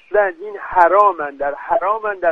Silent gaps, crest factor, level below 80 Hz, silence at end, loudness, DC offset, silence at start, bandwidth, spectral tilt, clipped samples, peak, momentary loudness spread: none; 16 dB; -52 dBFS; 0 s; -16 LUFS; under 0.1%; 0.1 s; 6 kHz; -6 dB/octave; under 0.1%; 0 dBFS; 11 LU